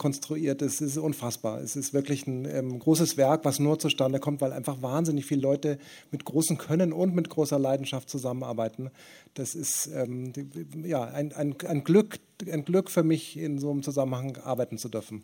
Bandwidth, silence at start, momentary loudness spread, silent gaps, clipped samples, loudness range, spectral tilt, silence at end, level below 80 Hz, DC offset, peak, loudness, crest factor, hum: 19 kHz; 0 s; 11 LU; none; under 0.1%; 5 LU; -5.5 dB/octave; 0 s; -72 dBFS; under 0.1%; -10 dBFS; -28 LUFS; 20 dB; none